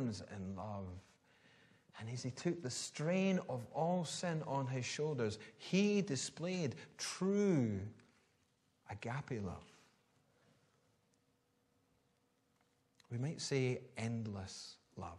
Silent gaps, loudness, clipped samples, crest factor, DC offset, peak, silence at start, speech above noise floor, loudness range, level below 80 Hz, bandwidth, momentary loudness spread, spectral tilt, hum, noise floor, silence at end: none; -40 LUFS; under 0.1%; 20 dB; under 0.1%; -22 dBFS; 0 s; 39 dB; 13 LU; -76 dBFS; 12.5 kHz; 14 LU; -5.5 dB/octave; none; -79 dBFS; 0 s